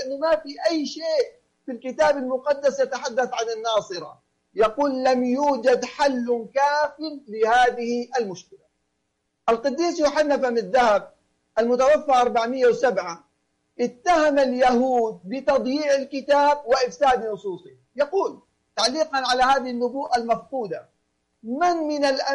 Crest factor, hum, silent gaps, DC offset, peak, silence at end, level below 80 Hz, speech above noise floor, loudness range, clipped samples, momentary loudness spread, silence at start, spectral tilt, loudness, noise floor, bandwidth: 14 dB; none; none; under 0.1%; -8 dBFS; 0 s; -58 dBFS; 53 dB; 3 LU; under 0.1%; 13 LU; 0 s; -3.5 dB/octave; -22 LUFS; -75 dBFS; 11.5 kHz